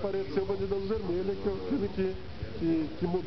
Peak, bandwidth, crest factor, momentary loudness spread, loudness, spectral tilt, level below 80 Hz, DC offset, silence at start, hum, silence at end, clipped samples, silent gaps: -18 dBFS; 6.2 kHz; 14 dB; 4 LU; -32 LUFS; -7 dB/octave; -48 dBFS; 0.9%; 0 s; none; 0 s; under 0.1%; none